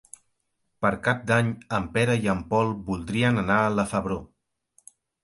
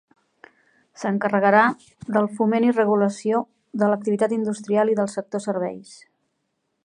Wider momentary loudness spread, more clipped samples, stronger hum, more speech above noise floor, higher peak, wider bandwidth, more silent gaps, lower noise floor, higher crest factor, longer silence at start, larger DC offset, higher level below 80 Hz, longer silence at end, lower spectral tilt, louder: second, 7 LU vs 11 LU; neither; neither; about the same, 51 dB vs 53 dB; second, -6 dBFS vs -2 dBFS; about the same, 11.5 kHz vs 10.5 kHz; neither; about the same, -75 dBFS vs -74 dBFS; about the same, 20 dB vs 20 dB; second, 0.8 s vs 1 s; neither; first, -50 dBFS vs -70 dBFS; about the same, 1 s vs 0.9 s; about the same, -6 dB/octave vs -6.5 dB/octave; second, -25 LUFS vs -22 LUFS